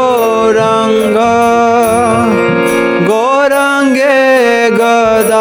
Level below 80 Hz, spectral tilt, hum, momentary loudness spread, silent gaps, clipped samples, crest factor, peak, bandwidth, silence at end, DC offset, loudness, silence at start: -44 dBFS; -4.5 dB/octave; none; 3 LU; none; under 0.1%; 8 dB; 0 dBFS; 19.5 kHz; 0 s; under 0.1%; -9 LUFS; 0 s